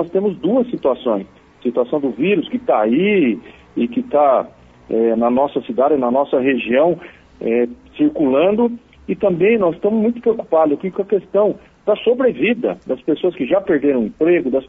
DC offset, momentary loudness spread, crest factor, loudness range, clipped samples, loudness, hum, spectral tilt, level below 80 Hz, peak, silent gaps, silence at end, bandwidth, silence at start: under 0.1%; 7 LU; 14 dB; 1 LU; under 0.1%; -17 LUFS; none; -9 dB/octave; -54 dBFS; -4 dBFS; none; 0.05 s; 3.9 kHz; 0 s